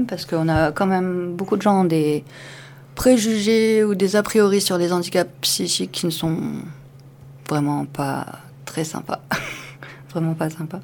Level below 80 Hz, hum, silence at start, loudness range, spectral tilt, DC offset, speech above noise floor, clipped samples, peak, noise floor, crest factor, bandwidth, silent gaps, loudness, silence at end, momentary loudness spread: -48 dBFS; none; 0 s; 8 LU; -5 dB/octave; under 0.1%; 23 dB; under 0.1%; -2 dBFS; -43 dBFS; 18 dB; 19 kHz; none; -20 LUFS; 0 s; 18 LU